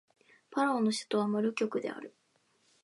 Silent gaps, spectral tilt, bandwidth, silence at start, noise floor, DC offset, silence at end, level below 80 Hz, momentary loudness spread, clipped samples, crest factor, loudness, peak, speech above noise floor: none; -5 dB/octave; 11.5 kHz; 0.5 s; -72 dBFS; under 0.1%; 0.75 s; -86 dBFS; 13 LU; under 0.1%; 16 dB; -32 LUFS; -18 dBFS; 41 dB